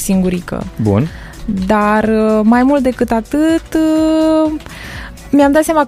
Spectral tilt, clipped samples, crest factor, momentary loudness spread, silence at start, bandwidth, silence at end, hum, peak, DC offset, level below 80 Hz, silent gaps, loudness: -6.5 dB/octave; under 0.1%; 12 dB; 14 LU; 0 s; 15 kHz; 0 s; none; 0 dBFS; under 0.1%; -34 dBFS; none; -13 LUFS